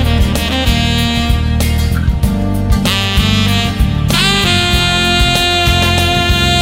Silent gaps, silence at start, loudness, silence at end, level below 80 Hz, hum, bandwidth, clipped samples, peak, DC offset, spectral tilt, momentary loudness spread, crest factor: none; 0 s; -12 LUFS; 0 s; -18 dBFS; none; 16.5 kHz; under 0.1%; 0 dBFS; under 0.1%; -4.5 dB/octave; 4 LU; 12 dB